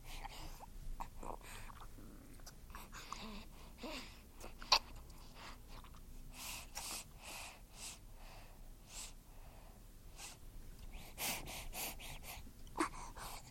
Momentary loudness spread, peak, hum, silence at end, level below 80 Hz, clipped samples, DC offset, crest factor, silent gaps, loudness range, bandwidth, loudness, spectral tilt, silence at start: 17 LU; -14 dBFS; none; 0 s; -54 dBFS; under 0.1%; under 0.1%; 34 dB; none; 11 LU; 16.5 kHz; -45 LUFS; -2 dB/octave; 0 s